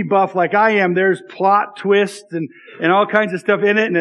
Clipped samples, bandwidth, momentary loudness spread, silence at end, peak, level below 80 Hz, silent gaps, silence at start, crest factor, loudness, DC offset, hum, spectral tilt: under 0.1%; 11.5 kHz; 10 LU; 0 s; 0 dBFS; -78 dBFS; none; 0 s; 16 dB; -16 LUFS; under 0.1%; none; -6 dB/octave